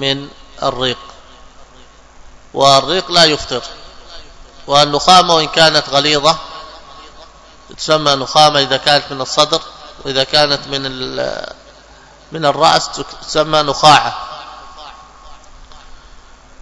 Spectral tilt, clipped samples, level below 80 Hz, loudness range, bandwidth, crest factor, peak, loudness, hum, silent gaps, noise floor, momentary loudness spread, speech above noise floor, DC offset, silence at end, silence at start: -3 dB/octave; 0.5%; -42 dBFS; 5 LU; 11 kHz; 16 dB; 0 dBFS; -12 LUFS; none; none; -41 dBFS; 22 LU; 29 dB; under 0.1%; 0.65 s; 0 s